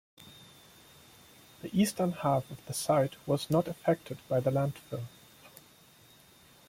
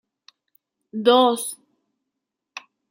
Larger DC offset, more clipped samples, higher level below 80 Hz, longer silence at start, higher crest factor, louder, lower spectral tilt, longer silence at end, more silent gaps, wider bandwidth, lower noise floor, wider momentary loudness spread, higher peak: neither; neither; first, -66 dBFS vs -82 dBFS; second, 0.2 s vs 0.95 s; about the same, 18 dB vs 22 dB; second, -31 LUFS vs -19 LUFS; first, -6 dB/octave vs -3 dB/octave; first, 1.2 s vs 0.3 s; neither; about the same, 16.5 kHz vs 16.5 kHz; second, -59 dBFS vs -82 dBFS; about the same, 24 LU vs 24 LU; second, -14 dBFS vs -2 dBFS